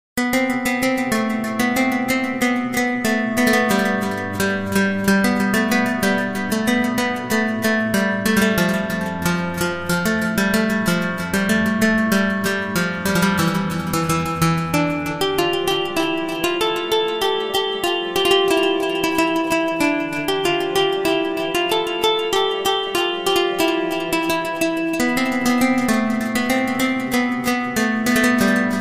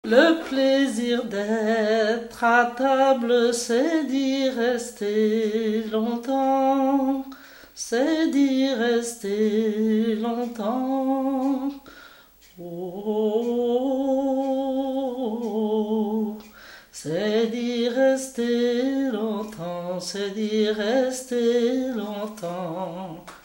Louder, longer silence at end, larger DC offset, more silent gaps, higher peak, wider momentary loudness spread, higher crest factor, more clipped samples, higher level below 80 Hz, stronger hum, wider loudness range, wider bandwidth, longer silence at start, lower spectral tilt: first, -19 LUFS vs -23 LUFS; about the same, 0 s vs 0.1 s; neither; neither; about the same, -4 dBFS vs -2 dBFS; second, 4 LU vs 11 LU; about the same, 16 dB vs 20 dB; neither; first, -48 dBFS vs -62 dBFS; neither; second, 1 LU vs 5 LU; about the same, 16 kHz vs 16 kHz; about the same, 0.15 s vs 0.05 s; about the same, -4.5 dB/octave vs -4.5 dB/octave